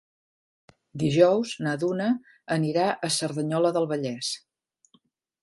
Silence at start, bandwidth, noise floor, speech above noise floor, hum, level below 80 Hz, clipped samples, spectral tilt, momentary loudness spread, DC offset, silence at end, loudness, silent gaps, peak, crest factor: 0.95 s; 11.5 kHz; -66 dBFS; 41 dB; none; -68 dBFS; under 0.1%; -5 dB/octave; 10 LU; under 0.1%; 1.05 s; -25 LUFS; none; -6 dBFS; 20 dB